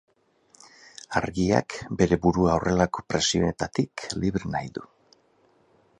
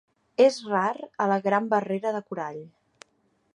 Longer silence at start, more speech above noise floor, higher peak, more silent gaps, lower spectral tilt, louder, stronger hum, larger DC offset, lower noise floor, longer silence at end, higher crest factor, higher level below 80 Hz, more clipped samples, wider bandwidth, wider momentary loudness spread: first, 1.1 s vs 0.4 s; second, 38 dB vs 44 dB; first, -4 dBFS vs -8 dBFS; neither; about the same, -5 dB/octave vs -5.5 dB/octave; about the same, -25 LUFS vs -26 LUFS; neither; neither; second, -63 dBFS vs -69 dBFS; first, 1.15 s vs 0.85 s; about the same, 22 dB vs 20 dB; first, -46 dBFS vs -78 dBFS; neither; about the same, 11 kHz vs 11 kHz; about the same, 13 LU vs 13 LU